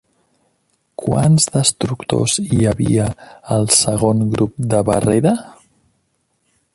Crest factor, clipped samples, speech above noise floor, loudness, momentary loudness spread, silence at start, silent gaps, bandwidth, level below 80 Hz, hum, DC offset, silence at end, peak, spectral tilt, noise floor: 18 dB; under 0.1%; 50 dB; -16 LUFS; 10 LU; 1 s; none; 11.5 kHz; -42 dBFS; none; under 0.1%; 1.25 s; 0 dBFS; -5 dB/octave; -66 dBFS